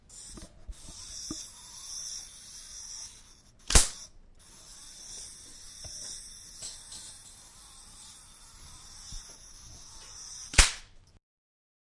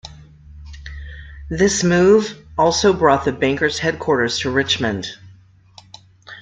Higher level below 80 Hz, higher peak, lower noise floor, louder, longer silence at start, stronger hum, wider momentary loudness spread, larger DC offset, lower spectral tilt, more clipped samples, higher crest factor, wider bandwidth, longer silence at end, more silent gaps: about the same, -40 dBFS vs -42 dBFS; about the same, -2 dBFS vs -2 dBFS; first, -56 dBFS vs -48 dBFS; second, -31 LUFS vs -17 LUFS; about the same, 0.1 s vs 0.05 s; neither; first, 26 LU vs 21 LU; neither; second, -1.5 dB/octave vs -4 dB/octave; neither; first, 32 dB vs 18 dB; first, 11.5 kHz vs 9.4 kHz; first, 0.8 s vs 0 s; neither